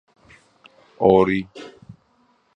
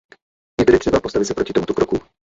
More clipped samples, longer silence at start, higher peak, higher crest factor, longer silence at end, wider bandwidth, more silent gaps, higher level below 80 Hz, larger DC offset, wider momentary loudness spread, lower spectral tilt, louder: neither; first, 1 s vs 0.6 s; about the same, 0 dBFS vs -2 dBFS; about the same, 22 dB vs 18 dB; first, 0.85 s vs 0.35 s; about the same, 7.8 kHz vs 8 kHz; neither; second, -52 dBFS vs -40 dBFS; neither; first, 25 LU vs 8 LU; first, -8 dB/octave vs -5.5 dB/octave; about the same, -18 LUFS vs -18 LUFS